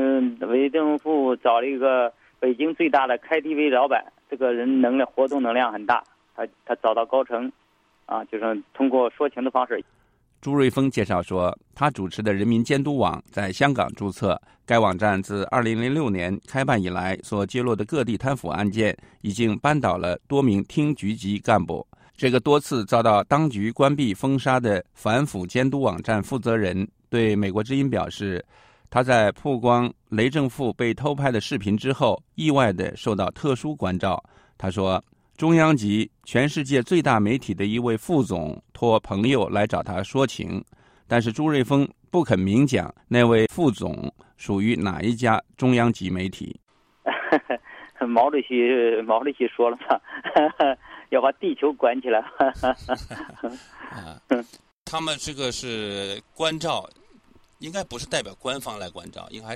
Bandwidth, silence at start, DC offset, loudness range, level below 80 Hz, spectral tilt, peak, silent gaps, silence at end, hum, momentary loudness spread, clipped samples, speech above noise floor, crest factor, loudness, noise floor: 15 kHz; 0 s; under 0.1%; 4 LU; -54 dBFS; -6 dB/octave; -4 dBFS; 54.72-54.86 s; 0 s; none; 11 LU; under 0.1%; 32 dB; 18 dB; -23 LUFS; -55 dBFS